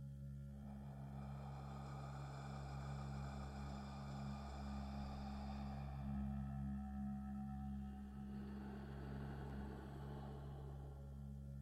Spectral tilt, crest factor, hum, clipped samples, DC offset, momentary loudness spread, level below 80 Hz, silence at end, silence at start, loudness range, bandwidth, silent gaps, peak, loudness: -7.5 dB/octave; 12 dB; none; under 0.1%; under 0.1%; 6 LU; -54 dBFS; 0 s; 0 s; 3 LU; 12.5 kHz; none; -36 dBFS; -51 LUFS